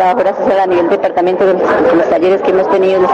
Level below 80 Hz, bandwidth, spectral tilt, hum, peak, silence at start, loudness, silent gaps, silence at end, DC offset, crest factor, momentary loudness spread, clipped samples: -48 dBFS; 7.8 kHz; -7 dB/octave; none; -4 dBFS; 0 s; -11 LUFS; none; 0 s; under 0.1%; 6 dB; 2 LU; under 0.1%